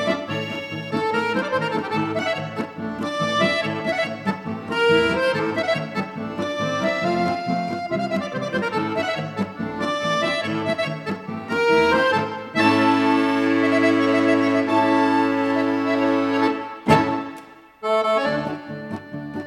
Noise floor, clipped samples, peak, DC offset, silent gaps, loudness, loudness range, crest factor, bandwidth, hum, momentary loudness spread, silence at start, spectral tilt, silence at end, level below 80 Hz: -42 dBFS; under 0.1%; -4 dBFS; under 0.1%; none; -21 LUFS; 6 LU; 18 dB; 13 kHz; none; 11 LU; 0 s; -5.5 dB/octave; 0 s; -56 dBFS